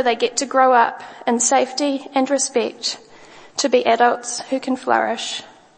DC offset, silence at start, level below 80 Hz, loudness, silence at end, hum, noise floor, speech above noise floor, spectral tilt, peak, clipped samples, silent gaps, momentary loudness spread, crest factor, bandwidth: under 0.1%; 0 s; -70 dBFS; -19 LUFS; 0.3 s; none; -44 dBFS; 25 dB; -1 dB/octave; -2 dBFS; under 0.1%; none; 10 LU; 18 dB; 8.8 kHz